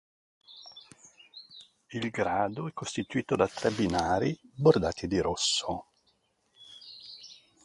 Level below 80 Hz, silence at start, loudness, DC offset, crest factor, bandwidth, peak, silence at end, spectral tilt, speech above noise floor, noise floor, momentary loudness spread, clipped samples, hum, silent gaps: -54 dBFS; 0.5 s; -29 LUFS; under 0.1%; 22 dB; 11.5 kHz; -8 dBFS; 0.3 s; -4.5 dB/octave; 43 dB; -72 dBFS; 23 LU; under 0.1%; none; none